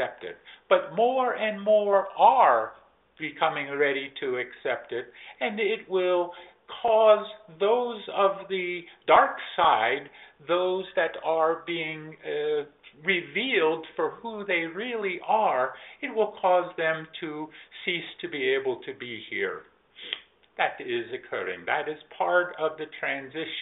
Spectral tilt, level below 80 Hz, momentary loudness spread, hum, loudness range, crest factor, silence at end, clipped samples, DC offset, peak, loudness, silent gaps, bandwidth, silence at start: -1.5 dB/octave; -72 dBFS; 15 LU; none; 7 LU; 22 dB; 0 s; under 0.1%; under 0.1%; -6 dBFS; -26 LUFS; none; 4 kHz; 0 s